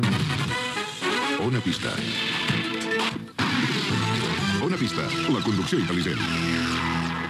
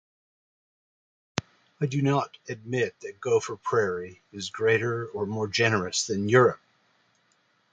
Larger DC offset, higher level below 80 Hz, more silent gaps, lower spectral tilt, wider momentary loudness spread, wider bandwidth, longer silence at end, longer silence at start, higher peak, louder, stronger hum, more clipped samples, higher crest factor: neither; first, -52 dBFS vs -62 dBFS; neither; about the same, -4.5 dB/octave vs -4.5 dB/octave; second, 3 LU vs 14 LU; first, 14 kHz vs 9.4 kHz; second, 0 s vs 1.15 s; second, 0 s vs 1.35 s; second, -10 dBFS vs -4 dBFS; about the same, -25 LUFS vs -26 LUFS; neither; neither; second, 14 dB vs 24 dB